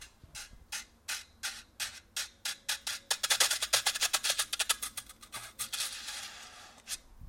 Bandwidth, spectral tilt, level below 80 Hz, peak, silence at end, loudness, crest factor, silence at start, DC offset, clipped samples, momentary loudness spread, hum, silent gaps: 16.5 kHz; 2 dB/octave; -64 dBFS; -10 dBFS; 0 s; -33 LUFS; 26 dB; 0 s; under 0.1%; under 0.1%; 19 LU; none; none